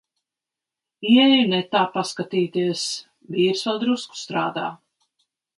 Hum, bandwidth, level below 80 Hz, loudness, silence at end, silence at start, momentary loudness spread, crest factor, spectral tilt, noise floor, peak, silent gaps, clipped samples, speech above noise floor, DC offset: none; 11.5 kHz; -70 dBFS; -21 LUFS; 0.85 s; 1 s; 14 LU; 18 dB; -4.5 dB/octave; -88 dBFS; -4 dBFS; none; under 0.1%; 67 dB; under 0.1%